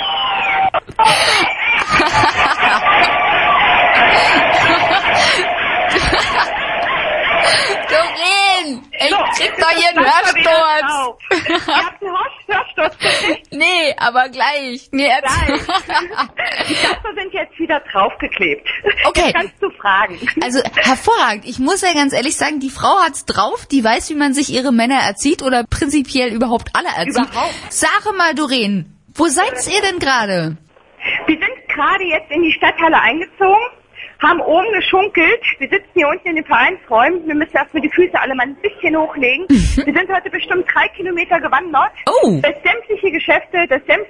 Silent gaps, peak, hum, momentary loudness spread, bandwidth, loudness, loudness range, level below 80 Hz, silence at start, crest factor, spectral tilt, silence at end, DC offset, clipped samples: none; 0 dBFS; none; 7 LU; 11.5 kHz; -14 LUFS; 5 LU; -36 dBFS; 0 s; 14 dB; -3 dB/octave; 0 s; under 0.1%; under 0.1%